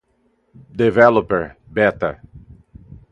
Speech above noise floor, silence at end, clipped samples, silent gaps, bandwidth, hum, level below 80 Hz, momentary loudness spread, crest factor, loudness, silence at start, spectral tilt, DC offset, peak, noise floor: 47 dB; 0.15 s; under 0.1%; none; 7.6 kHz; none; -46 dBFS; 16 LU; 20 dB; -17 LUFS; 0.75 s; -8 dB/octave; under 0.1%; 0 dBFS; -63 dBFS